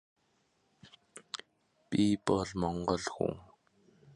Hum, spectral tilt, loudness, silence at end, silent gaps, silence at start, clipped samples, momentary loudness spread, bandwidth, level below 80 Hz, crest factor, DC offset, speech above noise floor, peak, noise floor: none; -5.5 dB/octave; -34 LUFS; 0.75 s; none; 0.85 s; under 0.1%; 19 LU; 11.5 kHz; -58 dBFS; 22 dB; under 0.1%; 43 dB; -14 dBFS; -74 dBFS